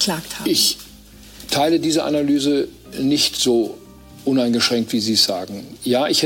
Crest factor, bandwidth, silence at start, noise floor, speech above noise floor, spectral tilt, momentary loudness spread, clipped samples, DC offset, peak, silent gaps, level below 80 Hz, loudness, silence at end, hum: 16 dB; 17 kHz; 0 s; -42 dBFS; 24 dB; -3 dB/octave; 11 LU; under 0.1%; under 0.1%; -4 dBFS; none; -52 dBFS; -18 LUFS; 0 s; none